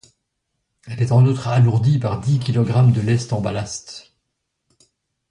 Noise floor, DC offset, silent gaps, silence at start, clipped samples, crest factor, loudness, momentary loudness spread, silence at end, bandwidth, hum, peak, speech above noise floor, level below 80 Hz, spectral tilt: -75 dBFS; under 0.1%; none; 0.85 s; under 0.1%; 14 dB; -18 LUFS; 15 LU; 1.3 s; 10 kHz; none; -4 dBFS; 58 dB; -48 dBFS; -7 dB/octave